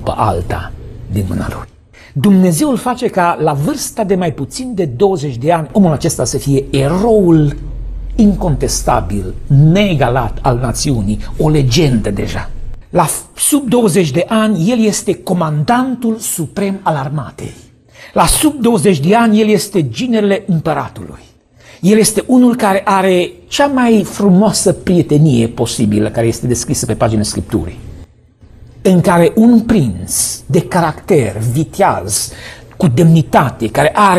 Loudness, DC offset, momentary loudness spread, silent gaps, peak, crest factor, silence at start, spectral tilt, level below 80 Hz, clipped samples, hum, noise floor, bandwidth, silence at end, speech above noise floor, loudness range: -13 LUFS; under 0.1%; 11 LU; none; 0 dBFS; 12 dB; 0 s; -5.5 dB/octave; -30 dBFS; under 0.1%; none; -42 dBFS; 14.5 kHz; 0 s; 31 dB; 3 LU